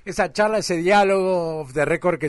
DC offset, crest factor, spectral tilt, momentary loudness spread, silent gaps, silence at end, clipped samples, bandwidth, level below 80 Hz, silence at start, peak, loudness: under 0.1%; 12 dB; -5 dB/octave; 7 LU; none; 0 s; under 0.1%; 11.5 kHz; -48 dBFS; 0.05 s; -8 dBFS; -20 LUFS